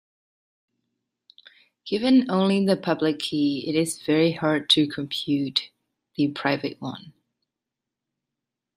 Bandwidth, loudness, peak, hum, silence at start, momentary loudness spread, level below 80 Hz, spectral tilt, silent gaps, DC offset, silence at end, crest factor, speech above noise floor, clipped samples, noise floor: 15 kHz; -23 LUFS; -4 dBFS; none; 1.85 s; 15 LU; -68 dBFS; -5 dB/octave; none; under 0.1%; 1.65 s; 20 dB; 63 dB; under 0.1%; -86 dBFS